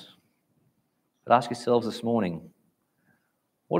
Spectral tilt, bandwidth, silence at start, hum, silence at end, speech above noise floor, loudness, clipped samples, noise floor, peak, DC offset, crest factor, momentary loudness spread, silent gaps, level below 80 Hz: -6.5 dB/octave; 15.5 kHz; 0 s; none; 0 s; 50 dB; -26 LUFS; under 0.1%; -75 dBFS; -4 dBFS; under 0.1%; 24 dB; 8 LU; none; -72 dBFS